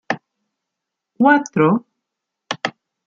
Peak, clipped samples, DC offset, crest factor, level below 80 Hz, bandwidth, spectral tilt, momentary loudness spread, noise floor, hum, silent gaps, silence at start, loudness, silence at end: -2 dBFS; under 0.1%; under 0.1%; 18 dB; -68 dBFS; 7.6 kHz; -6 dB/octave; 13 LU; -81 dBFS; none; none; 0.1 s; -18 LUFS; 0.35 s